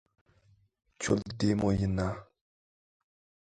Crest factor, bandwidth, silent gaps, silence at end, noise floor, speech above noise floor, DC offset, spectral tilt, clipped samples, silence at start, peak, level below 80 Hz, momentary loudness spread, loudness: 22 dB; 9.4 kHz; none; 1.25 s; -66 dBFS; 37 dB; under 0.1%; -6 dB/octave; under 0.1%; 1 s; -12 dBFS; -50 dBFS; 9 LU; -31 LUFS